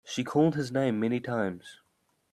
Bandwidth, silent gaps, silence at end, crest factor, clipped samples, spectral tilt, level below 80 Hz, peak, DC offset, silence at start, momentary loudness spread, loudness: 13 kHz; none; 0.55 s; 18 dB; under 0.1%; -6.5 dB/octave; -70 dBFS; -12 dBFS; under 0.1%; 0.05 s; 7 LU; -28 LUFS